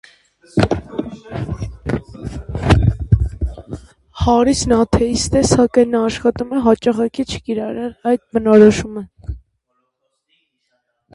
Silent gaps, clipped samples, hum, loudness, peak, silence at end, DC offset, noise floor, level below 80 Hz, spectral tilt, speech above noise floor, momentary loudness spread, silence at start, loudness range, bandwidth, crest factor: none; under 0.1%; none; -16 LUFS; 0 dBFS; 1.75 s; under 0.1%; -70 dBFS; -30 dBFS; -6 dB/octave; 55 dB; 17 LU; 0.55 s; 5 LU; 11.5 kHz; 18 dB